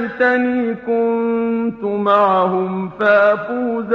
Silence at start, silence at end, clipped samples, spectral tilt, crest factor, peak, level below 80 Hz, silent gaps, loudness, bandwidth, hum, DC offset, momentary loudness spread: 0 s; 0 s; under 0.1%; -8 dB/octave; 16 dB; 0 dBFS; -58 dBFS; none; -16 LUFS; 6 kHz; none; under 0.1%; 7 LU